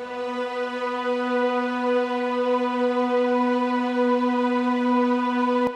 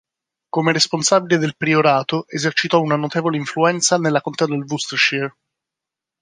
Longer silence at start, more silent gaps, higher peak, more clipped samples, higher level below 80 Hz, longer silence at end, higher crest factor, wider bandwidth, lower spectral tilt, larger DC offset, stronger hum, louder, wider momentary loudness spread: second, 0 s vs 0.55 s; neither; second, -12 dBFS vs 0 dBFS; neither; about the same, -70 dBFS vs -66 dBFS; second, 0 s vs 0.9 s; second, 12 dB vs 18 dB; second, 9 kHz vs 10 kHz; first, -5 dB/octave vs -3.5 dB/octave; neither; neither; second, -23 LUFS vs -18 LUFS; about the same, 6 LU vs 7 LU